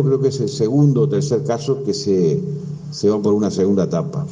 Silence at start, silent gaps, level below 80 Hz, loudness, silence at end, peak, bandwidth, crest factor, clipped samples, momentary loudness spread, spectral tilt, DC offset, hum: 0 s; none; -58 dBFS; -18 LUFS; 0 s; -4 dBFS; 9.6 kHz; 14 dB; under 0.1%; 7 LU; -7.5 dB/octave; under 0.1%; none